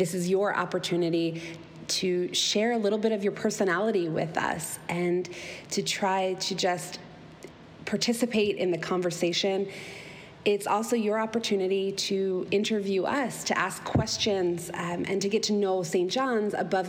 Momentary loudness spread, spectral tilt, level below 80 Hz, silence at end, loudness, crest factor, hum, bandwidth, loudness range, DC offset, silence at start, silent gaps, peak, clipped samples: 11 LU; -4 dB/octave; -60 dBFS; 0 s; -28 LUFS; 14 dB; none; 17 kHz; 2 LU; under 0.1%; 0 s; none; -14 dBFS; under 0.1%